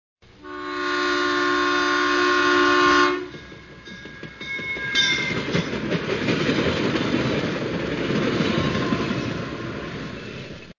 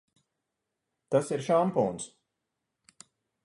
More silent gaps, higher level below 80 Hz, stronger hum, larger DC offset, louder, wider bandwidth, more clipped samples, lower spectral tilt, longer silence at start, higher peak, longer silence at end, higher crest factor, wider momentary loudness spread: neither; first, -46 dBFS vs -72 dBFS; neither; neither; first, -22 LUFS vs -28 LUFS; second, 7.4 kHz vs 11.5 kHz; neither; second, -4.5 dB/octave vs -6 dB/octave; second, 0.4 s vs 1.1 s; first, -6 dBFS vs -12 dBFS; second, 0.05 s vs 1.35 s; about the same, 18 dB vs 20 dB; first, 19 LU vs 13 LU